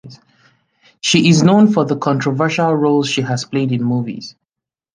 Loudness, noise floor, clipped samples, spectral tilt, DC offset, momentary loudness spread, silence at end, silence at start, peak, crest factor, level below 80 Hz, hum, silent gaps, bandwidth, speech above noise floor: -15 LUFS; -86 dBFS; under 0.1%; -5.5 dB/octave; under 0.1%; 11 LU; 0.65 s; 0.05 s; 0 dBFS; 16 dB; -56 dBFS; none; none; 10 kHz; 71 dB